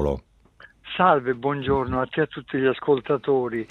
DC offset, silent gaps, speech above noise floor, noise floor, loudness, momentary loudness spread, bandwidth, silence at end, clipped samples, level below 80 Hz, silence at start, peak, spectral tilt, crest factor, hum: under 0.1%; none; 30 dB; -52 dBFS; -23 LUFS; 7 LU; 4.4 kHz; 0.05 s; under 0.1%; -44 dBFS; 0 s; -4 dBFS; -8.5 dB/octave; 20 dB; none